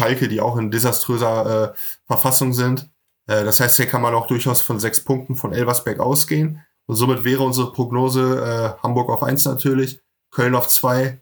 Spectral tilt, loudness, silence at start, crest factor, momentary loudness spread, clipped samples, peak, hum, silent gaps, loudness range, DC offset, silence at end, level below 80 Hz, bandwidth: -4.5 dB/octave; -18 LUFS; 0 s; 18 dB; 8 LU; under 0.1%; 0 dBFS; none; none; 3 LU; under 0.1%; 0.05 s; -62 dBFS; over 20 kHz